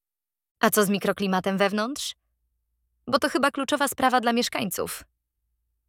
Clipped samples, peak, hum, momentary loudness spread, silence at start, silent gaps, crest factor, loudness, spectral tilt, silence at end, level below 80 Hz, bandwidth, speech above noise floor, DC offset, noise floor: under 0.1%; -4 dBFS; none; 11 LU; 0.6 s; none; 22 dB; -24 LUFS; -3.5 dB/octave; 0.85 s; -64 dBFS; 18.5 kHz; over 66 dB; under 0.1%; under -90 dBFS